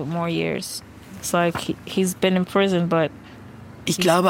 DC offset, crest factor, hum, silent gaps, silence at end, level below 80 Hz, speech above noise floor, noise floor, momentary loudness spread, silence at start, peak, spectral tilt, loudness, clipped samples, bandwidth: under 0.1%; 18 dB; none; none; 0 s; -56 dBFS; 20 dB; -41 dBFS; 22 LU; 0 s; -4 dBFS; -5 dB/octave; -22 LUFS; under 0.1%; 17 kHz